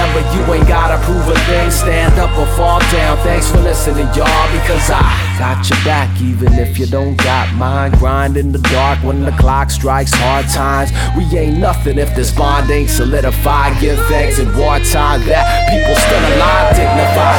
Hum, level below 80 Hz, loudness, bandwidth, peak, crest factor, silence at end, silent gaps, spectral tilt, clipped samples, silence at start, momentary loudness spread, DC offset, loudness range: none; -14 dBFS; -12 LUFS; 18.5 kHz; 0 dBFS; 10 dB; 0 s; none; -5 dB/octave; under 0.1%; 0 s; 4 LU; under 0.1%; 2 LU